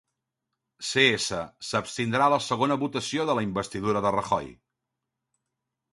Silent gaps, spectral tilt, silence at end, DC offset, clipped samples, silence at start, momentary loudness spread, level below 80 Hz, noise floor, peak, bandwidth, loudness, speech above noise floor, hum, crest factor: none; -4 dB/octave; 1.4 s; under 0.1%; under 0.1%; 0.8 s; 9 LU; -60 dBFS; -84 dBFS; -6 dBFS; 11.5 kHz; -26 LUFS; 58 dB; none; 22 dB